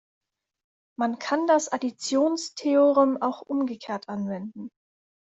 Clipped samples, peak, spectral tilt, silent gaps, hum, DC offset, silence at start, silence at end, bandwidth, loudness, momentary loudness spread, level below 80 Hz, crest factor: under 0.1%; -8 dBFS; -4.5 dB/octave; none; none; under 0.1%; 1 s; 0.7 s; 8.2 kHz; -25 LUFS; 15 LU; -72 dBFS; 18 dB